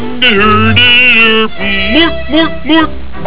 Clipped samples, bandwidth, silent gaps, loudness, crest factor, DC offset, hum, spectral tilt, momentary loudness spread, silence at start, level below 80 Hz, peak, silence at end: 0.3%; 4 kHz; none; -7 LUFS; 10 dB; 20%; none; -8.5 dB/octave; 9 LU; 0 s; -28 dBFS; 0 dBFS; 0 s